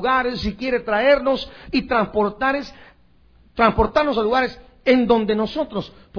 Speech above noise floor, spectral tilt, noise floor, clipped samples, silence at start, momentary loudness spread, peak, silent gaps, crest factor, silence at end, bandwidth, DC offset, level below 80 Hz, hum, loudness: 35 dB; -6.5 dB/octave; -54 dBFS; under 0.1%; 0 s; 10 LU; -2 dBFS; none; 18 dB; 0 s; 5.4 kHz; under 0.1%; -40 dBFS; none; -20 LUFS